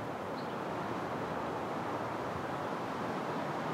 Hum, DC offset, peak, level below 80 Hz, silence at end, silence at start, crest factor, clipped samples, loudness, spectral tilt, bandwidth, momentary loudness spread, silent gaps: none; under 0.1%; -24 dBFS; -70 dBFS; 0 s; 0 s; 12 dB; under 0.1%; -38 LUFS; -6 dB/octave; 16 kHz; 2 LU; none